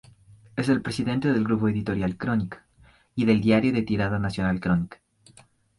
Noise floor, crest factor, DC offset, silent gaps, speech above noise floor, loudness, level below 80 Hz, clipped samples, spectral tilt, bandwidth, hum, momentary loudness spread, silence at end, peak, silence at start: -58 dBFS; 18 dB; under 0.1%; none; 34 dB; -25 LUFS; -48 dBFS; under 0.1%; -7.5 dB/octave; 11.5 kHz; none; 12 LU; 0.85 s; -8 dBFS; 0.55 s